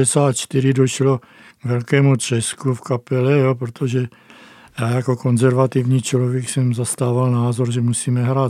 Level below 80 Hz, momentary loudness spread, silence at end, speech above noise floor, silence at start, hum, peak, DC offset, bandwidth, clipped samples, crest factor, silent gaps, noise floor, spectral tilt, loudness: -64 dBFS; 8 LU; 0 s; 27 dB; 0 s; none; -2 dBFS; under 0.1%; 14 kHz; under 0.1%; 16 dB; none; -44 dBFS; -6 dB/octave; -18 LUFS